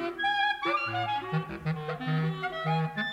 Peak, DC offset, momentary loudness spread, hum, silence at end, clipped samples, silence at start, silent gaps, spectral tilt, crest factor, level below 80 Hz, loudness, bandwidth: -16 dBFS; under 0.1%; 6 LU; none; 0 s; under 0.1%; 0 s; none; -6.5 dB/octave; 14 dB; -60 dBFS; -30 LUFS; 8.6 kHz